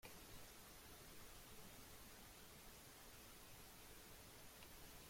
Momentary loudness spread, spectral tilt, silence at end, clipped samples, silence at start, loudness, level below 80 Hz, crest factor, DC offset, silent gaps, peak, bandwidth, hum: 1 LU; -2.5 dB/octave; 0 s; under 0.1%; 0 s; -60 LUFS; -70 dBFS; 16 dB; under 0.1%; none; -44 dBFS; 16.5 kHz; none